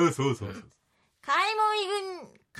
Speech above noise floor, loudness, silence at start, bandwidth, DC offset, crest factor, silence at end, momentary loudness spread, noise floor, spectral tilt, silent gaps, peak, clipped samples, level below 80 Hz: 34 dB; -27 LUFS; 0 s; 14 kHz; under 0.1%; 16 dB; 0 s; 19 LU; -62 dBFS; -4.5 dB/octave; none; -12 dBFS; under 0.1%; -70 dBFS